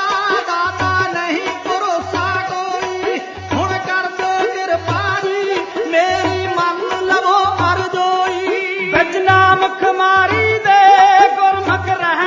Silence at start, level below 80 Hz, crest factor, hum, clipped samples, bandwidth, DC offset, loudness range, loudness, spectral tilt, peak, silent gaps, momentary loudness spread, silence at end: 0 s; -42 dBFS; 14 dB; none; under 0.1%; 7.6 kHz; under 0.1%; 7 LU; -15 LUFS; -4.5 dB/octave; 0 dBFS; none; 9 LU; 0 s